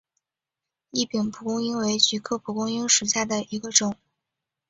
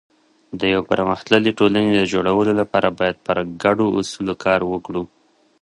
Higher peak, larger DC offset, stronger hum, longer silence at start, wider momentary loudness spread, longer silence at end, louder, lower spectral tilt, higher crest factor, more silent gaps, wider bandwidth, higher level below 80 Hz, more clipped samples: second, -4 dBFS vs 0 dBFS; neither; neither; first, 0.95 s vs 0.5 s; about the same, 10 LU vs 8 LU; first, 0.75 s vs 0.55 s; second, -23 LUFS vs -19 LUFS; second, -2 dB/octave vs -5.5 dB/octave; about the same, 24 dB vs 20 dB; neither; second, 8.4 kHz vs 11.5 kHz; second, -66 dBFS vs -50 dBFS; neither